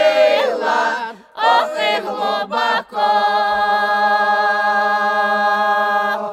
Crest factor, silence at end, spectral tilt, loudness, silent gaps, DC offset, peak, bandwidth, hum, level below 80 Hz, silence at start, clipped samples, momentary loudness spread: 14 dB; 0 s; -2.5 dB/octave; -16 LUFS; none; under 0.1%; -2 dBFS; 14 kHz; none; -62 dBFS; 0 s; under 0.1%; 5 LU